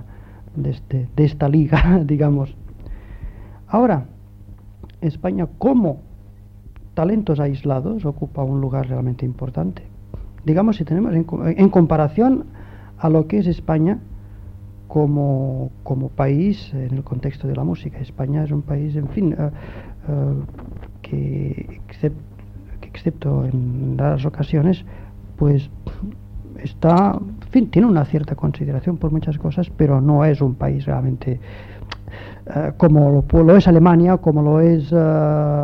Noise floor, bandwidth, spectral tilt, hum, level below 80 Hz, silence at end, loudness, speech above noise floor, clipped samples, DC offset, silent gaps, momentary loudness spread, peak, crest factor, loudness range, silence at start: -41 dBFS; 5.6 kHz; -10.5 dB/octave; none; -34 dBFS; 0 s; -18 LUFS; 24 dB; under 0.1%; under 0.1%; none; 22 LU; -2 dBFS; 16 dB; 8 LU; 0 s